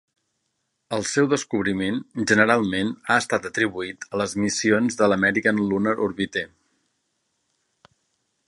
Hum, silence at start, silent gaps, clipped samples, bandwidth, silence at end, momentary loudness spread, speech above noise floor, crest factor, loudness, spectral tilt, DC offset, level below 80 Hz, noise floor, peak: none; 0.9 s; none; under 0.1%; 11.5 kHz; 2 s; 9 LU; 53 dB; 22 dB; -22 LUFS; -4.5 dB/octave; under 0.1%; -58 dBFS; -75 dBFS; -2 dBFS